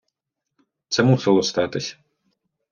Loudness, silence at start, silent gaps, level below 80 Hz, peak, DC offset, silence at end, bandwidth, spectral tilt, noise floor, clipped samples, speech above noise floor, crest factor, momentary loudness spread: -20 LUFS; 0.9 s; none; -62 dBFS; -4 dBFS; under 0.1%; 0.8 s; 7.4 kHz; -5.5 dB/octave; -81 dBFS; under 0.1%; 62 dB; 20 dB; 11 LU